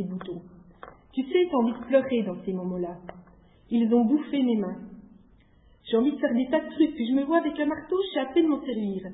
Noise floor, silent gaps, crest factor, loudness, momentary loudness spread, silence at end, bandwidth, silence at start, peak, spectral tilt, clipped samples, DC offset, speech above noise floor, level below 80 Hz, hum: -58 dBFS; none; 18 dB; -26 LUFS; 13 LU; 0 s; 4 kHz; 0 s; -10 dBFS; -10.5 dB/octave; under 0.1%; under 0.1%; 32 dB; -60 dBFS; none